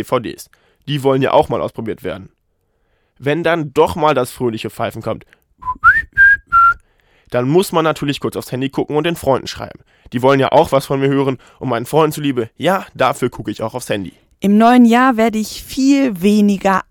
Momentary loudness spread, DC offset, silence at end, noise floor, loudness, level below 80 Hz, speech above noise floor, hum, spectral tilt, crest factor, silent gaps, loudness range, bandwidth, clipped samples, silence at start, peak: 15 LU; under 0.1%; 0.1 s; -64 dBFS; -15 LUFS; -44 dBFS; 48 dB; none; -5.5 dB/octave; 16 dB; none; 5 LU; 18 kHz; under 0.1%; 0 s; 0 dBFS